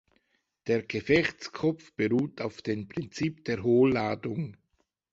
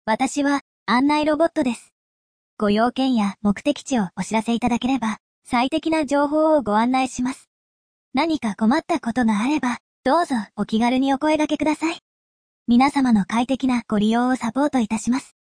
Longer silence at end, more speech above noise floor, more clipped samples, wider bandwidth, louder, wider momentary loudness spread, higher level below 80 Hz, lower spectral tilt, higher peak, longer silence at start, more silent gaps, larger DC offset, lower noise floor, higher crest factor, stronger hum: first, 0.6 s vs 0.25 s; second, 47 dB vs over 70 dB; neither; second, 7.8 kHz vs 10.5 kHz; second, -29 LUFS vs -21 LUFS; first, 12 LU vs 7 LU; second, -60 dBFS vs -52 dBFS; first, -6.5 dB/octave vs -5 dB/octave; second, -10 dBFS vs -6 dBFS; first, 0.65 s vs 0.05 s; second, none vs 0.61-0.86 s, 1.92-2.57 s, 5.20-5.42 s, 7.47-8.12 s, 9.80-10.03 s, 12.02-12.66 s; neither; second, -75 dBFS vs under -90 dBFS; first, 20 dB vs 14 dB; neither